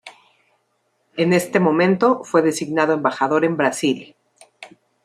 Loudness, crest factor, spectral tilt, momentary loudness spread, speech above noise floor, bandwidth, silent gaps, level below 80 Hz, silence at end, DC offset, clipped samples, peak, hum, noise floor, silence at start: -18 LUFS; 18 dB; -5.5 dB/octave; 6 LU; 50 dB; 15 kHz; none; -66 dBFS; 0.4 s; under 0.1%; under 0.1%; -2 dBFS; none; -68 dBFS; 0.05 s